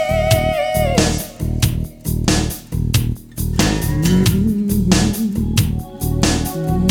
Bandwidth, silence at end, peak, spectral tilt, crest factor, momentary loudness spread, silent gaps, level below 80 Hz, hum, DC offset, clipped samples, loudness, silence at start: 19 kHz; 0 s; -2 dBFS; -5 dB/octave; 16 dB; 8 LU; none; -26 dBFS; none; under 0.1%; under 0.1%; -18 LUFS; 0 s